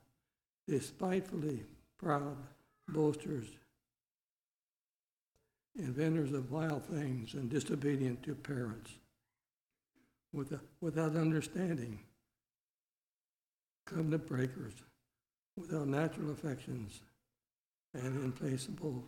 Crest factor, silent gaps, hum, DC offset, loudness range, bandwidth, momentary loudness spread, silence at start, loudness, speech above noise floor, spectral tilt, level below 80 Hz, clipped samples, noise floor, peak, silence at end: 22 dB; 4.11-5.32 s, 9.61-9.65 s, 12.60-13.76 s, 13.82-13.86 s, 15.38-15.57 s, 17.59-17.72 s, 17.80-17.91 s; none; under 0.1%; 5 LU; 16 kHz; 16 LU; 0.7 s; -39 LUFS; over 52 dB; -7 dB/octave; -70 dBFS; under 0.1%; under -90 dBFS; -18 dBFS; 0 s